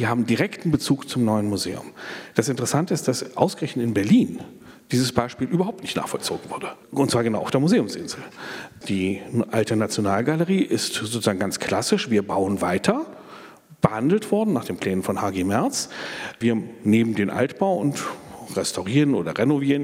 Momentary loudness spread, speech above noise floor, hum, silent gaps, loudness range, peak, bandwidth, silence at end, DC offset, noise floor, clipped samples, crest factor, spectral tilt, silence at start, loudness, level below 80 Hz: 11 LU; 22 dB; none; none; 2 LU; -2 dBFS; 16.5 kHz; 0 s; under 0.1%; -44 dBFS; under 0.1%; 22 dB; -5.5 dB/octave; 0 s; -23 LUFS; -62 dBFS